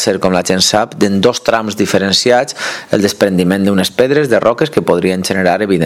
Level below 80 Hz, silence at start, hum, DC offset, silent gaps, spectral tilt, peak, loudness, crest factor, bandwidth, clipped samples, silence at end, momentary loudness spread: -48 dBFS; 0 s; none; under 0.1%; none; -4.5 dB/octave; 0 dBFS; -12 LUFS; 12 dB; 16 kHz; 0.2%; 0 s; 4 LU